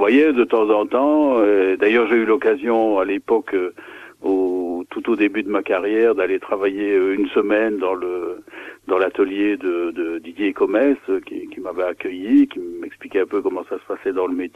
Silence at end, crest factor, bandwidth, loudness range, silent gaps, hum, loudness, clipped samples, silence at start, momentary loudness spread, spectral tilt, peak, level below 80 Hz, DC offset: 0.1 s; 16 dB; 6.4 kHz; 5 LU; none; none; -19 LUFS; under 0.1%; 0 s; 12 LU; -6.5 dB/octave; -2 dBFS; -62 dBFS; under 0.1%